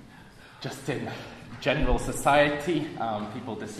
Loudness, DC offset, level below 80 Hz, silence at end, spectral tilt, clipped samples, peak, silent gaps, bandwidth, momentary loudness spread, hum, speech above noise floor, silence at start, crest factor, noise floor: -27 LUFS; under 0.1%; -40 dBFS; 0 s; -5 dB/octave; under 0.1%; -8 dBFS; none; 14 kHz; 16 LU; none; 22 dB; 0 s; 20 dB; -49 dBFS